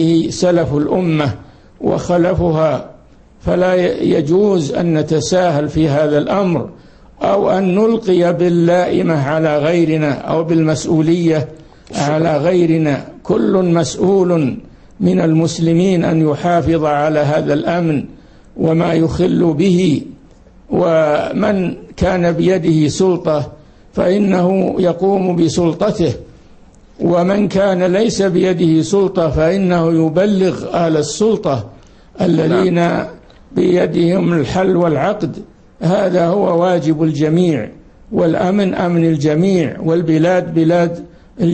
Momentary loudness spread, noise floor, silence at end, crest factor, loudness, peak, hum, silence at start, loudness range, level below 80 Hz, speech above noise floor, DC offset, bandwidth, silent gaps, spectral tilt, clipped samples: 7 LU; -43 dBFS; 0 s; 12 dB; -14 LUFS; -2 dBFS; none; 0 s; 2 LU; -40 dBFS; 29 dB; under 0.1%; 8.8 kHz; none; -7 dB/octave; under 0.1%